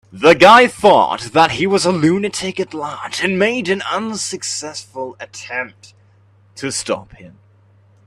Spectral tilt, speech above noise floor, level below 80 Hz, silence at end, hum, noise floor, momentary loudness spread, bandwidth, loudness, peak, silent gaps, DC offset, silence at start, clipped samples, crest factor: -4 dB/octave; 35 dB; -54 dBFS; 0.8 s; none; -51 dBFS; 19 LU; 13.5 kHz; -15 LUFS; 0 dBFS; none; under 0.1%; 0.15 s; under 0.1%; 16 dB